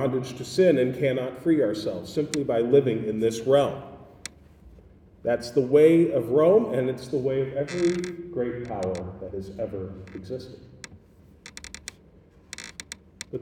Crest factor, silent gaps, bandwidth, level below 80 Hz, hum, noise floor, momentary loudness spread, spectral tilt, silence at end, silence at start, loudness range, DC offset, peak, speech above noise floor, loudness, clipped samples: 18 dB; none; 15 kHz; -56 dBFS; none; -54 dBFS; 22 LU; -6.5 dB/octave; 0 s; 0 s; 16 LU; under 0.1%; -8 dBFS; 30 dB; -24 LUFS; under 0.1%